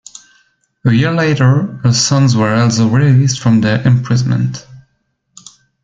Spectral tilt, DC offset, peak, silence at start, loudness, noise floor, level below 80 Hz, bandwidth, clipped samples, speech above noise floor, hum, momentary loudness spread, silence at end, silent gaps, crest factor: -5.5 dB/octave; under 0.1%; -2 dBFS; 0.85 s; -12 LUFS; -64 dBFS; -48 dBFS; 9 kHz; under 0.1%; 53 dB; none; 5 LU; 1.05 s; none; 12 dB